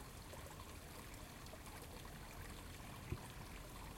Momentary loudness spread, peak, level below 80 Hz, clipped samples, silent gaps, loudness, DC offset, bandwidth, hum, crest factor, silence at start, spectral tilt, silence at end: 4 LU; -32 dBFS; -58 dBFS; under 0.1%; none; -53 LUFS; under 0.1%; 16.5 kHz; none; 22 dB; 0 s; -4 dB/octave; 0 s